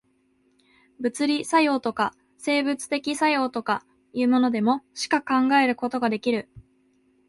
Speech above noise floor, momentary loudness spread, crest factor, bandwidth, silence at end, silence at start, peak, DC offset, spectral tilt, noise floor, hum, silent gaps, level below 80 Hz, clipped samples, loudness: 42 dB; 8 LU; 18 dB; 11.5 kHz; 0.7 s; 1 s; -8 dBFS; under 0.1%; -4 dB/octave; -66 dBFS; none; none; -66 dBFS; under 0.1%; -24 LUFS